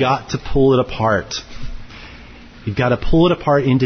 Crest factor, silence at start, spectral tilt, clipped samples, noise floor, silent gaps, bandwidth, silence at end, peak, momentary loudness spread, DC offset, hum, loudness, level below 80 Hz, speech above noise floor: 12 dB; 0 s; -6.5 dB/octave; under 0.1%; -38 dBFS; none; 6.6 kHz; 0 s; -4 dBFS; 22 LU; under 0.1%; none; -17 LUFS; -32 dBFS; 23 dB